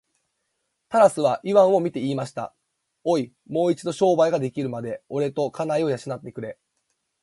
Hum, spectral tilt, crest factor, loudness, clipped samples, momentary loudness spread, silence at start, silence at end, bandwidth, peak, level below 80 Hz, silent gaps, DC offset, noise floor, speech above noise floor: none; -6.5 dB/octave; 20 dB; -23 LUFS; under 0.1%; 15 LU; 0.9 s; 0.7 s; 11.5 kHz; -4 dBFS; -68 dBFS; none; under 0.1%; -76 dBFS; 54 dB